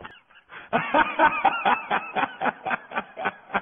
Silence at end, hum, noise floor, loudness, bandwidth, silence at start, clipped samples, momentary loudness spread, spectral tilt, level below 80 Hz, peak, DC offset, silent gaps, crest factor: 0 s; none; -48 dBFS; -24 LUFS; 3.9 kHz; 0 s; under 0.1%; 11 LU; -8 dB/octave; -60 dBFS; -6 dBFS; under 0.1%; none; 18 dB